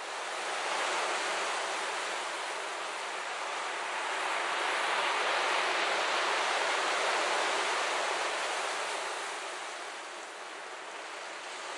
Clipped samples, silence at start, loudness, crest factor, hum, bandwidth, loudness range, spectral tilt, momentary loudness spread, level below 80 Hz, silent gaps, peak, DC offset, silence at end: under 0.1%; 0 s; -32 LUFS; 16 dB; none; 11.5 kHz; 6 LU; 1 dB/octave; 11 LU; under -90 dBFS; none; -16 dBFS; under 0.1%; 0 s